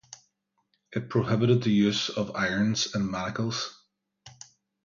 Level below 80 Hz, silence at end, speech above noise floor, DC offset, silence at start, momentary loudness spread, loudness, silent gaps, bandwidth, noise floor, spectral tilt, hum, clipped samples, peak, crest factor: -60 dBFS; 0.55 s; 49 dB; under 0.1%; 0.1 s; 13 LU; -27 LUFS; none; 7.4 kHz; -75 dBFS; -5 dB/octave; none; under 0.1%; -10 dBFS; 18 dB